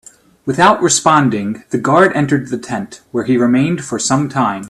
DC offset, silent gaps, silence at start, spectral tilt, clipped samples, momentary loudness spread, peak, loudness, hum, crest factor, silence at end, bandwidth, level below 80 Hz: under 0.1%; none; 0.45 s; -4.5 dB/octave; under 0.1%; 11 LU; 0 dBFS; -14 LUFS; none; 14 dB; 0 s; 13 kHz; -52 dBFS